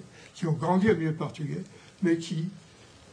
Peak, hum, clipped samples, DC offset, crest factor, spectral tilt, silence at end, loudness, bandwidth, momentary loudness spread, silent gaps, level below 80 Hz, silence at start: -10 dBFS; none; under 0.1%; under 0.1%; 18 dB; -7 dB/octave; 0.55 s; -29 LUFS; 10.5 kHz; 14 LU; none; -62 dBFS; 0 s